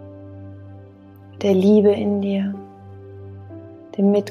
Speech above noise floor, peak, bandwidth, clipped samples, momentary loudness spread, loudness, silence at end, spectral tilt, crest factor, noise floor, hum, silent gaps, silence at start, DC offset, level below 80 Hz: 27 dB; -4 dBFS; 6.6 kHz; under 0.1%; 25 LU; -18 LUFS; 0 s; -8.5 dB/octave; 16 dB; -43 dBFS; none; none; 0 s; under 0.1%; -68 dBFS